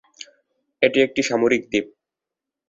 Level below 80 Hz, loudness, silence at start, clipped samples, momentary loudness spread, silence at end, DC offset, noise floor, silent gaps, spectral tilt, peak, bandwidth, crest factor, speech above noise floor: -62 dBFS; -20 LUFS; 0.8 s; under 0.1%; 23 LU; 0.8 s; under 0.1%; -86 dBFS; none; -4 dB/octave; -2 dBFS; 7.8 kHz; 20 dB; 67 dB